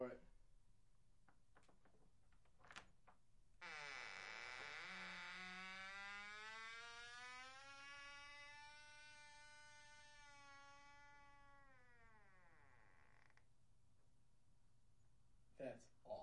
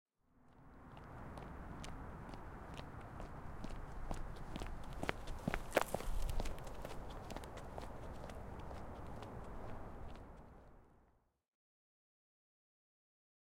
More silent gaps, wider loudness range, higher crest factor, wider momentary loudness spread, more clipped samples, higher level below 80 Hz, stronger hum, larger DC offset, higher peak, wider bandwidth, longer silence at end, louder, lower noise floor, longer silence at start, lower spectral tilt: neither; about the same, 13 LU vs 12 LU; second, 22 dB vs 30 dB; about the same, 12 LU vs 13 LU; neither; second, -78 dBFS vs -50 dBFS; neither; neither; second, -36 dBFS vs -16 dBFS; second, 10 kHz vs 16.5 kHz; second, 0 s vs 2.6 s; second, -56 LUFS vs -48 LUFS; first, -79 dBFS vs -74 dBFS; second, 0 s vs 0.35 s; second, -2.5 dB/octave vs -5 dB/octave